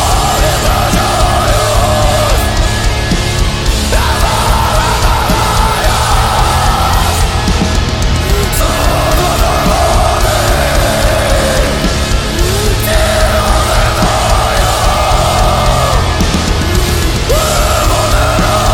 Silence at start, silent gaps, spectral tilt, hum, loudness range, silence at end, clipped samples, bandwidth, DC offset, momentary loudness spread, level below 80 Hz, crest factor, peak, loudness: 0 s; none; -4 dB/octave; none; 1 LU; 0 s; under 0.1%; 17.5 kHz; under 0.1%; 2 LU; -14 dBFS; 10 dB; 0 dBFS; -11 LUFS